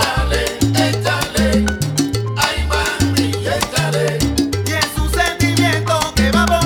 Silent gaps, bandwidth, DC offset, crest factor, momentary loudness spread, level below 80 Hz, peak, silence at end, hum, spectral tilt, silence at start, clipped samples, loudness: none; 19 kHz; under 0.1%; 16 dB; 3 LU; -26 dBFS; 0 dBFS; 0 s; none; -4.5 dB/octave; 0 s; under 0.1%; -16 LUFS